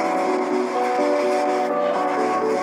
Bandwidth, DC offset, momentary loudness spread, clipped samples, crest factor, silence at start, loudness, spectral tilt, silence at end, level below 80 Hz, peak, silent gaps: 14.5 kHz; under 0.1%; 2 LU; under 0.1%; 12 dB; 0 s; -21 LUFS; -4.5 dB/octave; 0 s; -74 dBFS; -10 dBFS; none